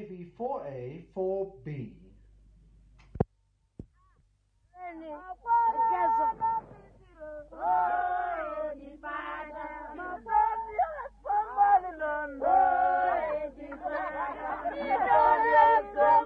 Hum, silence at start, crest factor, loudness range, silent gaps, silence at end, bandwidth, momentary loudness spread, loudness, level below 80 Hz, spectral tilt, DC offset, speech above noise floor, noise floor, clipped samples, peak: none; 0 s; 18 dB; 12 LU; none; 0 s; 4.9 kHz; 18 LU; -28 LUFS; -56 dBFS; -8 dB/octave; under 0.1%; 39 dB; -71 dBFS; under 0.1%; -10 dBFS